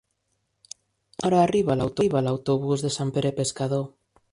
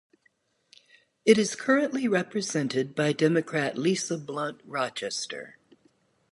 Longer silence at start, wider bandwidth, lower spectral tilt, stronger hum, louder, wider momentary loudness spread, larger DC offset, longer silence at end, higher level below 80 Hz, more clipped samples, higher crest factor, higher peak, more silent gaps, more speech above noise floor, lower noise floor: about the same, 1.2 s vs 1.25 s; about the same, 11.5 kHz vs 11.5 kHz; first, -6 dB/octave vs -4.5 dB/octave; neither; first, -24 LUFS vs -27 LUFS; first, 23 LU vs 10 LU; neither; second, 0.45 s vs 0.8 s; first, -56 dBFS vs -74 dBFS; neither; about the same, 18 dB vs 22 dB; about the same, -8 dBFS vs -6 dBFS; neither; first, 51 dB vs 43 dB; first, -75 dBFS vs -69 dBFS